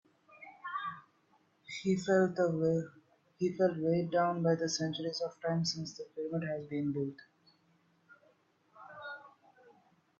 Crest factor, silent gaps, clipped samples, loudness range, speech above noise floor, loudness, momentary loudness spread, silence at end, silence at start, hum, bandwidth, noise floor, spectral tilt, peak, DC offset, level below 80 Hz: 18 dB; none; under 0.1%; 10 LU; 38 dB; -34 LUFS; 17 LU; 0.9 s; 0.3 s; none; 7.8 kHz; -71 dBFS; -5.5 dB/octave; -18 dBFS; under 0.1%; -76 dBFS